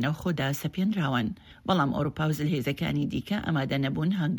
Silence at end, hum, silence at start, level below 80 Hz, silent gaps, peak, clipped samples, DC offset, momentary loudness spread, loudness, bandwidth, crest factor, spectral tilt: 0 s; none; 0 s; -54 dBFS; none; -10 dBFS; under 0.1%; under 0.1%; 4 LU; -28 LUFS; 19.5 kHz; 18 dB; -6.5 dB/octave